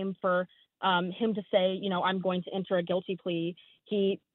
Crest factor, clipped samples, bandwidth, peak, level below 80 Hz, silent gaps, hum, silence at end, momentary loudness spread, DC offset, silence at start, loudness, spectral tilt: 18 dB; under 0.1%; 4.2 kHz; -14 dBFS; -76 dBFS; none; none; 0.2 s; 6 LU; under 0.1%; 0 s; -30 LUFS; -4 dB/octave